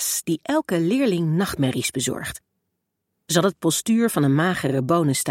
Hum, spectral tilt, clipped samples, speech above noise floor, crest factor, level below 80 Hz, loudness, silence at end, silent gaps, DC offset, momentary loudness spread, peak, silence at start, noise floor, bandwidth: none; -4.5 dB/octave; under 0.1%; 57 dB; 18 dB; -56 dBFS; -21 LUFS; 0 s; none; under 0.1%; 6 LU; -4 dBFS; 0 s; -78 dBFS; 17 kHz